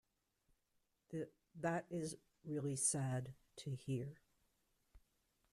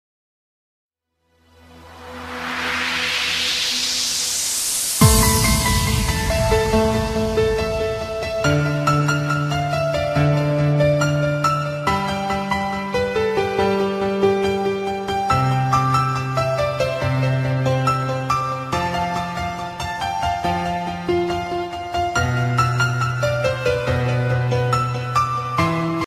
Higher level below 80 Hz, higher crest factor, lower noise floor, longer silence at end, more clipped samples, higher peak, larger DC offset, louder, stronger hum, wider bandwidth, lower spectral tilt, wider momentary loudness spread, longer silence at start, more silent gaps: second, -76 dBFS vs -34 dBFS; about the same, 22 dB vs 18 dB; first, -84 dBFS vs -67 dBFS; first, 0.55 s vs 0 s; neither; second, -24 dBFS vs -2 dBFS; neither; second, -44 LUFS vs -20 LUFS; neither; about the same, 13.5 kHz vs 14.5 kHz; about the same, -5 dB/octave vs -4.5 dB/octave; first, 15 LU vs 6 LU; second, 1.1 s vs 1.7 s; neither